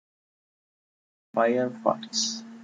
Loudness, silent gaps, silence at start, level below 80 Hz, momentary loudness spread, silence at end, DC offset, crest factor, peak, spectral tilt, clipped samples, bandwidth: -27 LUFS; none; 1.35 s; -78 dBFS; 5 LU; 0 s; under 0.1%; 22 dB; -8 dBFS; -2.5 dB/octave; under 0.1%; 9.4 kHz